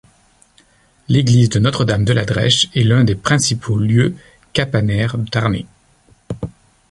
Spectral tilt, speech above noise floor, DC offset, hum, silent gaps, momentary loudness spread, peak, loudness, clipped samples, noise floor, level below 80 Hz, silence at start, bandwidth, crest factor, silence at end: -5 dB/octave; 38 dB; under 0.1%; none; none; 15 LU; -2 dBFS; -16 LUFS; under 0.1%; -53 dBFS; -40 dBFS; 1.1 s; 11.5 kHz; 16 dB; 0.4 s